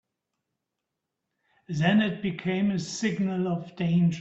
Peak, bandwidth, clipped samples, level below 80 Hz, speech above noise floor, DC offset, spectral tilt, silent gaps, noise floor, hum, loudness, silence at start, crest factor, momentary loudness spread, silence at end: -10 dBFS; 8 kHz; under 0.1%; -64 dBFS; 59 dB; under 0.1%; -6 dB/octave; none; -84 dBFS; none; -27 LUFS; 1.7 s; 18 dB; 7 LU; 0 s